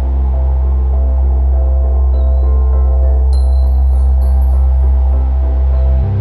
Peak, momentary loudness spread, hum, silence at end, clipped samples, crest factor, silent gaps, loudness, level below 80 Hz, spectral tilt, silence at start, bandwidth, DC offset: -4 dBFS; 2 LU; none; 0 s; under 0.1%; 6 dB; none; -13 LUFS; -10 dBFS; -10 dB/octave; 0 s; 1.6 kHz; under 0.1%